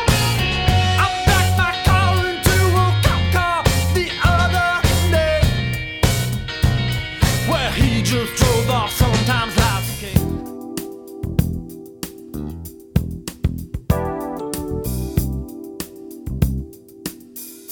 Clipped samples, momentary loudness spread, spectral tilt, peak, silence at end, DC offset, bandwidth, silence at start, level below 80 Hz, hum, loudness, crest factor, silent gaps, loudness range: under 0.1%; 16 LU; -5 dB/octave; 0 dBFS; 0 s; under 0.1%; over 20 kHz; 0 s; -28 dBFS; none; -18 LUFS; 18 dB; none; 9 LU